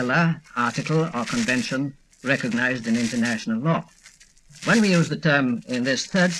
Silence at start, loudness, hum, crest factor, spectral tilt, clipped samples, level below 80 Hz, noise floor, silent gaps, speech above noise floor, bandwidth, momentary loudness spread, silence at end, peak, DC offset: 0 s; -23 LUFS; none; 18 dB; -5 dB/octave; under 0.1%; -58 dBFS; -52 dBFS; none; 29 dB; 12.5 kHz; 6 LU; 0 s; -4 dBFS; under 0.1%